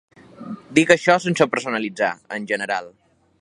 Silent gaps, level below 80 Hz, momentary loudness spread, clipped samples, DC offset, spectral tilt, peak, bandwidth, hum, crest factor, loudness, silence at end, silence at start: none; -64 dBFS; 17 LU; under 0.1%; under 0.1%; -4.5 dB/octave; 0 dBFS; 11.5 kHz; none; 22 dB; -20 LUFS; 0.55 s; 0.4 s